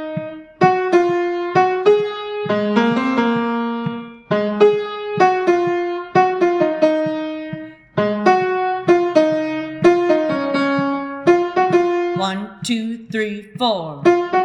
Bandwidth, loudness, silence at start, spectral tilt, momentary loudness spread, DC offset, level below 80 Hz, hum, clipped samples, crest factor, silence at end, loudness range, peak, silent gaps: 10.5 kHz; -18 LUFS; 0 s; -6 dB/octave; 10 LU; under 0.1%; -60 dBFS; none; under 0.1%; 18 dB; 0 s; 2 LU; 0 dBFS; none